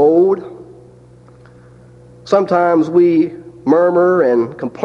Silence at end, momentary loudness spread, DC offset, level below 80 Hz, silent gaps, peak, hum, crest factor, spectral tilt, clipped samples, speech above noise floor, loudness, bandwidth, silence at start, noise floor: 0 s; 10 LU; under 0.1%; -56 dBFS; none; 0 dBFS; none; 14 dB; -8 dB/octave; under 0.1%; 30 dB; -14 LUFS; 7 kHz; 0 s; -42 dBFS